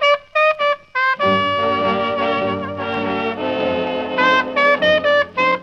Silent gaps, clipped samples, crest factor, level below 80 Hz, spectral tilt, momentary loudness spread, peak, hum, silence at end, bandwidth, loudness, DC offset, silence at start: none; under 0.1%; 14 dB; -56 dBFS; -5 dB/octave; 7 LU; -4 dBFS; none; 0 s; 7.4 kHz; -17 LUFS; under 0.1%; 0 s